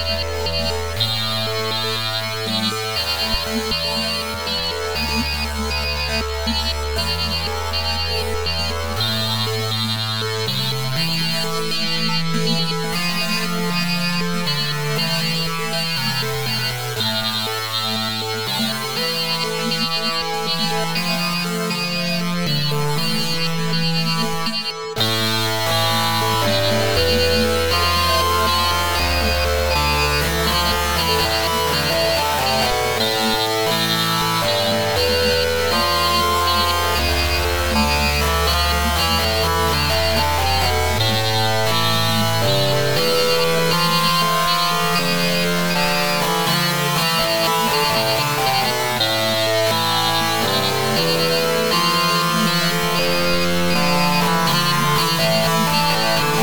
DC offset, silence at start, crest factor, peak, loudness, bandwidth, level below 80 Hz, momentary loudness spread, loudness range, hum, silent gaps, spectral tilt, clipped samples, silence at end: 2%; 0 s; 16 dB; -4 dBFS; -18 LUFS; over 20 kHz; -34 dBFS; 5 LU; 4 LU; none; none; -3.5 dB/octave; under 0.1%; 0 s